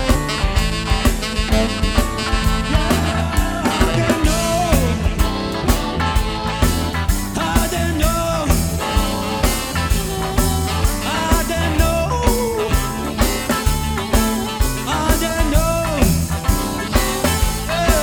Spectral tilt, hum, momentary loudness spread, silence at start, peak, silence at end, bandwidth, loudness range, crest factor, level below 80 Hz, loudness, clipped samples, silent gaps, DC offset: -4.5 dB/octave; none; 3 LU; 0 s; -2 dBFS; 0 s; over 20 kHz; 1 LU; 16 dB; -22 dBFS; -18 LUFS; under 0.1%; none; under 0.1%